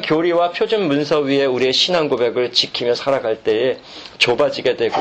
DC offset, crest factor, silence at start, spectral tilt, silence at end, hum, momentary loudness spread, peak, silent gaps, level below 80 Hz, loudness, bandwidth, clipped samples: under 0.1%; 16 dB; 0 s; -4 dB/octave; 0 s; none; 4 LU; -2 dBFS; none; -56 dBFS; -17 LUFS; 9 kHz; under 0.1%